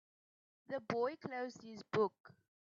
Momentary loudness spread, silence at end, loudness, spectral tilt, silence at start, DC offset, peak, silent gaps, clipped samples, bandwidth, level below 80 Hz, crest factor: 9 LU; 0.4 s; -41 LUFS; -4.5 dB/octave; 0.7 s; under 0.1%; -22 dBFS; 2.20-2.24 s; under 0.1%; 7.4 kHz; -86 dBFS; 20 dB